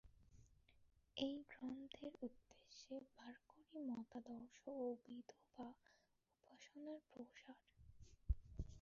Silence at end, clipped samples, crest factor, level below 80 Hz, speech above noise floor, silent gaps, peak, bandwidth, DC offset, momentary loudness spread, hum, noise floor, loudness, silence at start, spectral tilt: 0 s; under 0.1%; 26 dB; -60 dBFS; 29 dB; none; -28 dBFS; 7.2 kHz; under 0.1%; 16 LU; none; -82 dBFS; -54 LUFS; 0.05 s; -5.5 dB/octave